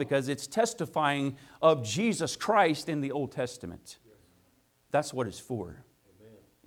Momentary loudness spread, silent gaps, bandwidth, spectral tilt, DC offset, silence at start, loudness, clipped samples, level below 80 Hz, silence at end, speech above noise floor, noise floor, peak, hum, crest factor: 14 LU; none; 17.5 kHz; -4.5 dB/octave; under 0.1%; 0 s; -29 LUFS; under 0.1%; -66 dBFS; 0.3 s; 38 dB; -68 dBFS; -8 dBFS; none; 22 dB